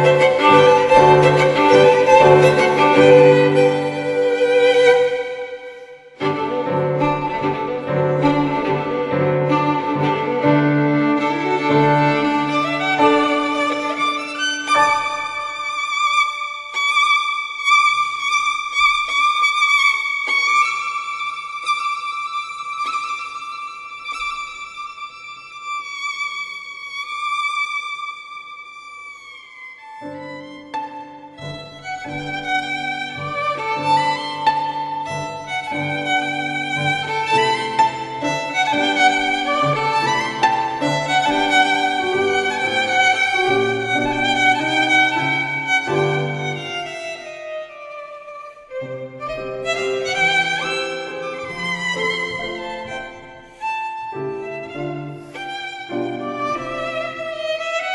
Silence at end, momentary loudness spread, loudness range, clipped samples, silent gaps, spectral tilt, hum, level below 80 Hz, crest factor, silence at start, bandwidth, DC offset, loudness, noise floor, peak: 0 s; 18 LU; 13 LU; under 0.1%; none; -4.5 dB/octave; none; -52 dBFS; 18 dB; 0 s; 11.5 kHz; under 0.1%; -17 LUFS; -39 dBFS; 0 dBFS